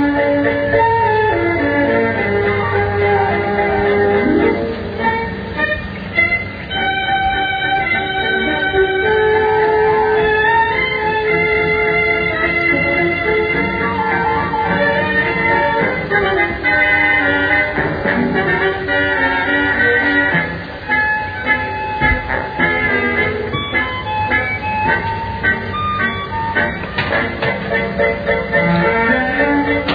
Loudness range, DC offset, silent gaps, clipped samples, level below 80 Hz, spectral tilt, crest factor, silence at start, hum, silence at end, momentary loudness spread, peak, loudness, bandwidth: 3 LU; under 0.1%; none; under 0.1%; -36 dBFS; -8 dB/octave; 14 dB; 0 s; none; 0 s; 5 LU; -2 dBFS; -15 LUFS; 5 kHz